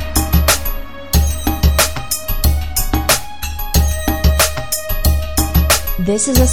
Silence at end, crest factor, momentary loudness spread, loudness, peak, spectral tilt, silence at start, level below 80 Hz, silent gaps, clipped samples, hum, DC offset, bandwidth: 0 s; 16 dB; 7 LU; -15 LUFS; 0 dBFS; -4 dB/octave; 0 s; -18 dBFS; none; under 0.1%; none; 4%; 16 kHz